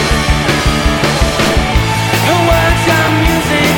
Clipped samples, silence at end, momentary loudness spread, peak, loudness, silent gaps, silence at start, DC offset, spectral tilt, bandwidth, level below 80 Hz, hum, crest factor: under 0.1%; 0 s; 2 LU; 0 dBFS; -11 LUFS; none; 0 s; under 0.1%; -4.5 dB/octave; over 20 kHz; -18 dBFS; none; 10 dB